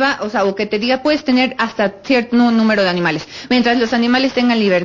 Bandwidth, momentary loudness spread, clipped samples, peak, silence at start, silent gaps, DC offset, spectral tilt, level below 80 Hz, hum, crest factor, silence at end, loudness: 7.4 kHz; 5 LU; under 0.1%; -4 dBFS; 0 s; none; under 0.1%; -5.5 dB/octave; -52 dBFS; none; 12 dB; 0 s; -15 LUFS